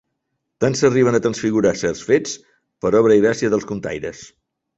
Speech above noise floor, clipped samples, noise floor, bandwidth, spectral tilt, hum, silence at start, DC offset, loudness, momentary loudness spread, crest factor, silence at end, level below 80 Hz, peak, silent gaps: 58 dB; under 0.1%; -75 dBFS; 8.2 kHz; -5.5 dB/octave; none; 0.6 s; under 0.1%; -18 LUFS; 13 LU; 16 dB; 0.55 s; -52 dBFS; -2 dBFS; none